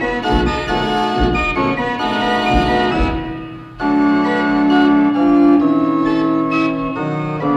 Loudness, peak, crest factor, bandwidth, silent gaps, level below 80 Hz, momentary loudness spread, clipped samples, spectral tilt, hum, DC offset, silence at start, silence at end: -15 LUFS; 0 dBFS; 14 dB; 8.8 kHz; none; -30 dBFS; 8 LU; under 0.1%; -6.5 dB/octave; none; under 0.1%; 0 s; 0 s